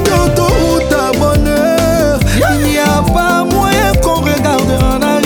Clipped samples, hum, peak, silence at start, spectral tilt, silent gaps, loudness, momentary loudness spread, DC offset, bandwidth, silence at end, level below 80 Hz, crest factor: under 0.1%; none; 0 dBFS; 0 s; -5 dB/octave; none; -11 LUFS; 1 LU; under 0.1%; over 20 kHz; 0 s; -20 dBFS; 10 dB